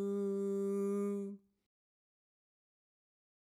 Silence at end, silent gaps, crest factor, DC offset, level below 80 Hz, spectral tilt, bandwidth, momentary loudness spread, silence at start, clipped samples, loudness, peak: 2.2 s; none; 12 dB; under 0.1%; under -90 dBFS; -8.5 dB/octave; 13 kHz; 10 LU; 0 s; under 0.1%; -38 LUFS; -30 dBFS